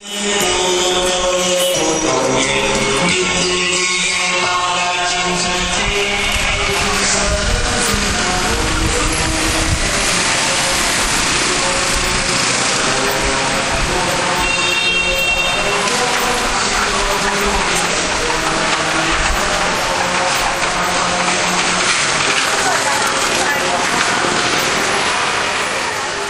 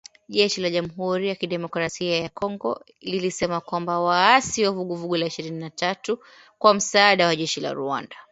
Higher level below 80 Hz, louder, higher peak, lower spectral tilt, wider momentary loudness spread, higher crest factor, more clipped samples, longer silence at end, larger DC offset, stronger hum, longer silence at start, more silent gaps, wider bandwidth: first, -30 dBFS vs -62 dBFS; first, -14 LUFS vs -23 LUFS; about the same, 0 dBFS vs 0 dBFS; second, -2 dB/octave vs -3.5 dB/octave; second, 2 LU vs 12 LU; second, 14 dB vs 22 dB; neither; about the same, 0 s vs 0.1 s; neither; neither; second, 0 s vs 0.3 s; neither; first, 15.5 kHz vs 8.2 kHz